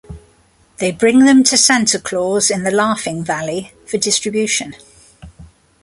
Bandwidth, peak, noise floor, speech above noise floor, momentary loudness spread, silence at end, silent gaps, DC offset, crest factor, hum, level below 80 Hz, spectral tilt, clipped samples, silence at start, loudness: 11.5 kHz; 0 dBFS; -53 dBFS; 38 dB; 12 LU; 0.4 s; none; under 0.1%; 16 dB; none; -48 dBFS; -2.5 dB/octave; under 0.1%; 0.1 s; -14 LUFS